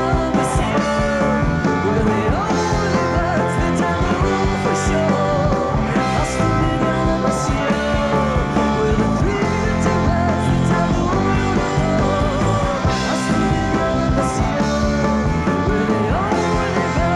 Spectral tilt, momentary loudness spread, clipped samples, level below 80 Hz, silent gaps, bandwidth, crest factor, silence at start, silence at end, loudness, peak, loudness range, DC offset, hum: -6 dB/octave; 1 LU; under 0.1%; -28 dBFS; none; 12 kHz; 14 dB; 0 s; 0 s; -18 LUFS; -4 dBFS; 1 LU; under 0.1%; none